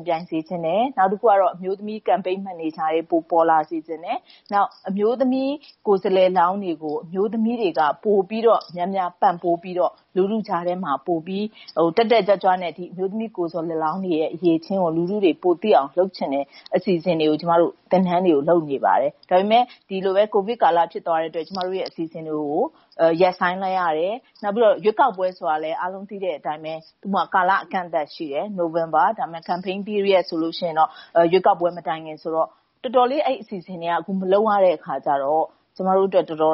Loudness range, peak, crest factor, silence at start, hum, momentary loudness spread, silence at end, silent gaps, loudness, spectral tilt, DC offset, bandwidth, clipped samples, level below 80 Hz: 3 LU; -4 dBFS; 16 dB; 0 s; none; 10 LU; 0 s; none; -21 LUFS; -4.5 dB/octave; under 0.1%; 5.8 kHz; under 0.1%; -72 dBFS